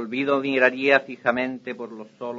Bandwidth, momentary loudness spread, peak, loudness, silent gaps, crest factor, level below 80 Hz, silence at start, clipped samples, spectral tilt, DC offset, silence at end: 7.6 kHz; 16 LU; -4 dBFS; -21 LUFS; none; 18 dB; -70 dBFS; 0 s; under 0.1%; -5.5 dB/octave; under 0.1%; 0 s